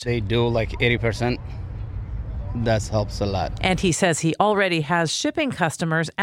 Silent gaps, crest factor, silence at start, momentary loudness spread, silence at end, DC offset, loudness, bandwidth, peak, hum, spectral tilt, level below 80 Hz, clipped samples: none; 20 dB; 0 s; 12 LU; 0 s; under 0.1%; -22 LUFS; 16 kHz; -4 dBFS; none; -5 dB/octave; -36 dBFS; under 0.1%